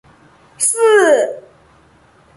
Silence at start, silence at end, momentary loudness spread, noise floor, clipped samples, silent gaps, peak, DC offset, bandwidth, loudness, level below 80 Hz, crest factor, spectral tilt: 0.6 s; 1 s; 12 LU; -50 dBFS; under 0.1%; none; -2 dBFS; under 0.1%; 12 kHz; -13 LUFS; -60 dBFS; 16 dB; -1 dB/octave